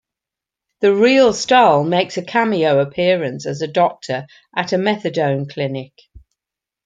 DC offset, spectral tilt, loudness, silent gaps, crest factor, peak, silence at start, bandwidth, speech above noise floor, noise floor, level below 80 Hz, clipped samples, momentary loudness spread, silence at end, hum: under 0.1%; -5 dB/octave; -17 LUFS; none; 16 dB; -2 dBFS; 0.8 s; 9.2 kHz; 70 dB; -86 dBFS; -58 dBFS; under 0.1%; 12 LU; 0.65 s; none